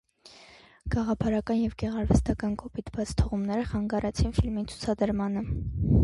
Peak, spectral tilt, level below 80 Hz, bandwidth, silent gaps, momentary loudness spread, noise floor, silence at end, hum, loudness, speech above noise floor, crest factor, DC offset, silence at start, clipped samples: -8 dBFS; -7.5 dB/octave; -36 dBFS; 11.5 kHz; none; 7 LU; -54 dBFS; 0 s; none; -29 LUFS; 27 dB; 18 dB; under 0.1%; 0.25 s; under 0.1%